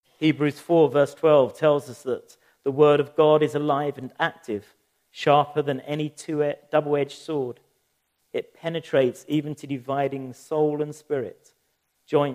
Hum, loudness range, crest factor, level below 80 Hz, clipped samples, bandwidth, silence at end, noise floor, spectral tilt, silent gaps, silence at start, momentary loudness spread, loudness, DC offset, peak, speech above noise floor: none; 7 LU; 20 dB; -74 dBFS; under 0.1%; 14.5 kHz; 0 s; -72 dBFS; -6.5 dB/octave; none; 0.2 s; 14 LU; -24 LUFS; under 0.1%; -4 dBFS; 49 dB